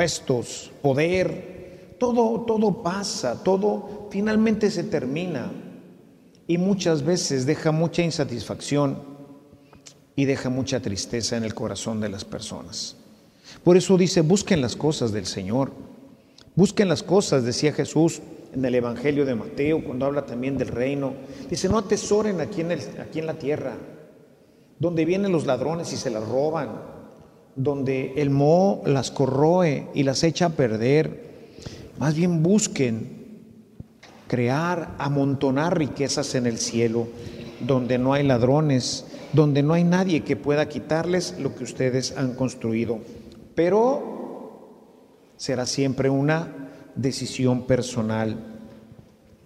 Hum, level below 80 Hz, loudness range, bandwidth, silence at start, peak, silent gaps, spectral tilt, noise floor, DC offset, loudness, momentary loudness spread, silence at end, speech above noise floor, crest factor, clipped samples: none; -54 dBFS; 5 LU; 13.5 kHz; 0 s; -4 dBFS; none; -5.5 dB/octave; -54 dBFS; under 0.1%; -23 LUFS; 14 LU; 0.7 s; 32 dB; 18 dB; under 0.1%